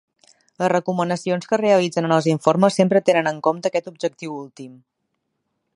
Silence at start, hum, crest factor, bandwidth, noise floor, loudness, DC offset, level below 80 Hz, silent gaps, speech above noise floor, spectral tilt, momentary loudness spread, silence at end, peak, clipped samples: 0.6 s; none; 20 dB; 11.5 kHz; -75 dBFS; -19 LUFS; under 0.1%; -70 dBFS; none; 55 dB; -6 dB/octave; 14 LU; 1 s; -2 dBFS; under 0.1%